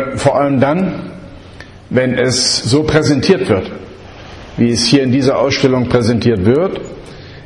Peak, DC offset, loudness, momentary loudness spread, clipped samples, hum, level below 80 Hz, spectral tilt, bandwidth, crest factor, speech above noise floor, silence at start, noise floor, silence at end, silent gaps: 0 dBFS; under 0.1%; -13 LUFS; 20 LU; under 0.1%; none; -40 dBFS; -5 dB/octave; 11.5 kHz; 14 dB; 22 dB; 0 s; -35 dBFS; 0 s; none